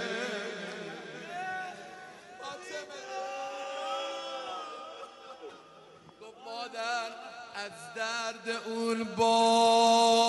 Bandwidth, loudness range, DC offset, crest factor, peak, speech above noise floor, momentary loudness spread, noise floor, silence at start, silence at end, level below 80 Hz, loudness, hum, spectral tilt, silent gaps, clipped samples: 11.5 kHz; 11 LU; under 0.1%; 20 dB; -12 dBFS; 27 dB; 24 LU; -54 dBFS; 0 s; 0 s; -80 dBFS; -31 LUFS; none; -2.5 dB/octave; none; under 0.1%